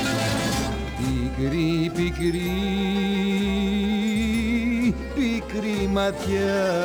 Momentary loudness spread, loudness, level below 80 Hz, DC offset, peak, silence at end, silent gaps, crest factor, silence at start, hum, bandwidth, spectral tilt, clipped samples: 3 LU; -24 LUFS; -36 dBFS; under 0.1%; -12 dBFS; 0 s; none; 12 dB; 0 s; none; over 20 kHz; -5.5 dB/octave; under 0.1%